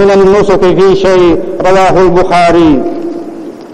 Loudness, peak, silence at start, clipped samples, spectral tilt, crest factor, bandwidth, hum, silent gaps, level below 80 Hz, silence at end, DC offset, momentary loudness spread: -7 LUFS; 0 dBFS; 0 s; 2%; -6.5 dB/octave; 6 dB; 10.5 kHz; none; none; -28 dBFS; 0 s; under 0.1%; 13 LU